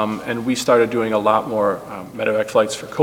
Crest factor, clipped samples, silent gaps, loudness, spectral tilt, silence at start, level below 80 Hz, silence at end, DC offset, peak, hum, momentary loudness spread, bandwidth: 18 dB; under 0.1%; none; -19 LUFS; -4.5 dB/octave; 0 s; -56 dBFS; 0 s; under 0.1%; -2 dBFS; none; 8 LU; 18 kHz